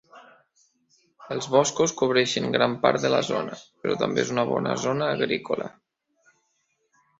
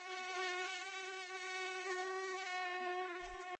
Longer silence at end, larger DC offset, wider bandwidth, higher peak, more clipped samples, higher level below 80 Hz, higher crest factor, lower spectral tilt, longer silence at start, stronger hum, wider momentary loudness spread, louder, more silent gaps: first, 1.5 s vs 0.05 s; neither; about the same, 8 kHz vs 8.8 kHz; first, -4 dBFS vs -30 dBFS; neither; first, -66 dBFS vs -72 dBFS; first, 22 dB vs 12 dB; first, -4 dB/octave vs -0.5 dB/octave; first, 0.15 s vs 0 s; neither; first, 10 LU vs 5 LU; first, -24 LUFS vs -42 LUFS; neither